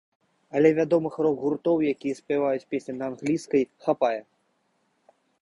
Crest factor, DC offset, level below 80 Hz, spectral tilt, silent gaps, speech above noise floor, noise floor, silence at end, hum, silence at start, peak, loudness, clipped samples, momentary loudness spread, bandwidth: 20 dB; under 0.1%; -68 dBFS; -7 dB/octave; none; 46 dB; -71 dBFS; 1.2 s; none; 0.55 s; -6 dBFS; -25 LUFS; under 0.1%; 10 LU; 11.5 kHz